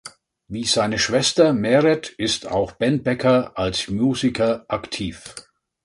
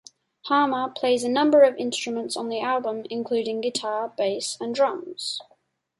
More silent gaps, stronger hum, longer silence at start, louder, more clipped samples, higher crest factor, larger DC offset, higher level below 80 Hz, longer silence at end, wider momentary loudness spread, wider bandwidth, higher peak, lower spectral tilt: neither; neither; second, 0.05 s vs 0.45 s; first, -20 LUFS vs -24 LUFS; neither; about the same, 18 dB vs 18 dB; neither; first, -48 dBFS vs -74 dBFS; about the same, 0.45 s vs 0.55 s; about the same, 12 LU vs 12 LU; about the same, 11.5 kHz vs 11.5 kHz; first, -2 dBFS vs -6 dBFS; first, -4.5 dB/octave vs -3 dB/octave